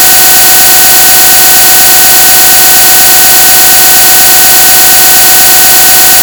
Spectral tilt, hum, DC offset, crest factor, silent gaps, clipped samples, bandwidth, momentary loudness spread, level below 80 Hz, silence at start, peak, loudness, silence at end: 1 dB/octave; none; 0.7%; 0 dB; none; 100%; over 20 kHz; 0 LU; -32 dBFS; 0 s; 0 dBFS; 3 LUFS; 0 s